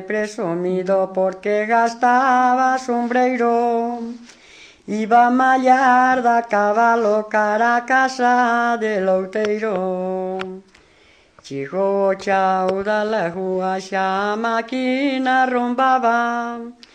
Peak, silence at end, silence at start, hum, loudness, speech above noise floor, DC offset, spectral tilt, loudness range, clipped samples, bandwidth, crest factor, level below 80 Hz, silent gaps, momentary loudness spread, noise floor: -4 dBFS; 0.2 s; 0 s; none; -18 LUFS; 35 dB; under 0.1%; -5.5 dB/octave; 6 LU; under 0.1%; 9.4 kHz; 16 dB; -64 dBFS; none; 10 LU; -53 dBFS